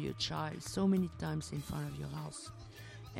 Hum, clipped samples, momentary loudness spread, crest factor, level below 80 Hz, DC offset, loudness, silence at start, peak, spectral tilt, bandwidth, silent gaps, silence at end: none; under 0.1%; 17 LU; 16 dB; -58 dBFS; under 0.1%; -38 LUFS; 0 s; -22 dBFS; -5.5 dB/octave; 16 kHz; none; 0 s